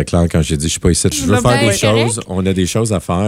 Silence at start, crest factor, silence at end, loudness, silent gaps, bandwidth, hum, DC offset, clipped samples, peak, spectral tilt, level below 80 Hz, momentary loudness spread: 0 s; 14 dB; 0 s; -14 LUFS; none; 16 kHz; none; under 0.1%; under 0.1%; 0 dBFS; -5 dB/octave; -30 dBFS; 5 LU